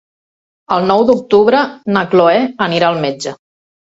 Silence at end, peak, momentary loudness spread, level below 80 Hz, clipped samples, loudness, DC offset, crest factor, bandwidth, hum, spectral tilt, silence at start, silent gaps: 0.65 s; 0 dBFS; 8 LU; -54 dBFS; under 0.1%; -13 LUFS; under 0.1%; 14 dB; 8 kHz; none; -5.5 dB/octave; 0.7 s; none